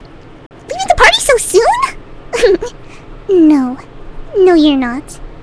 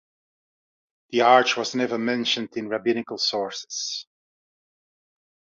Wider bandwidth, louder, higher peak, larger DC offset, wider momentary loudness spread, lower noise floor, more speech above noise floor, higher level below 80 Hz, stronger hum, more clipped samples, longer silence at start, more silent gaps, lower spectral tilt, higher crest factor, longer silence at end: first, 11 kHz vs 7.8 kHz; first, -11 LUFS vs -23 LUFS; about the same, 0 dBFS vs -2 dBFS; neither; first, 18 LU vs 12 LU; second, -31 dBFS vs under -90 dBFS; second, 21 dB vs over 67 dB; first, -32 dBFS vs -74 dBFS; neither; first, 0.4% vs under 0.1%; second, 0 s vs 1.1 s; first, 0.46-0.50 s vs none; about the same, -3 dB/octave vs -2.5 dB/octave; second, 12 dB vs 22 dB; second, 0 s vs 1.55 s